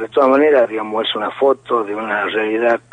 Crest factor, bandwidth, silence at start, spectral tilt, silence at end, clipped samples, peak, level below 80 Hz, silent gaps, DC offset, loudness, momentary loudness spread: 14 dB; 9.2 kHz; 0 s; -5.5 dB/octave; 0.15 s; under 0.1%; -2 dBFS; -64 dBFS; none; under 0.1%; -16 LUFS; 8 LU